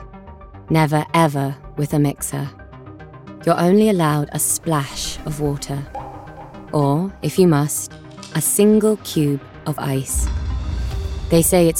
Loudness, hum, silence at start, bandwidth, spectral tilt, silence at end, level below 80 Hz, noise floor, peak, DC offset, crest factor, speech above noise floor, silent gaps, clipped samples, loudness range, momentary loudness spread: -19 LUFS; none; 0 s; 17.5 kHz; -5.5 dB/octave; 0 s; -32 dBFS; -38 dBFS; -4 dBFS; under 0.1%; 16 dB; 21 dB; none; under 0.1%; 3 LU; 20 LU